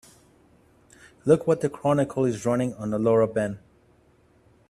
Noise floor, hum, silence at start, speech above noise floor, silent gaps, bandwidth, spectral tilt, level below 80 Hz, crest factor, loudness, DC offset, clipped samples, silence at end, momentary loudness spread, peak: -60 dBFS; none; 1.25 s; 37 dB; none; 12.5 kHz; -7.5 dB/octave; -60 dBFS; 20 dB; -24 LUFS; under 0.1%; under 0.1%; 1.1 s; 9 LU; -6 dBFS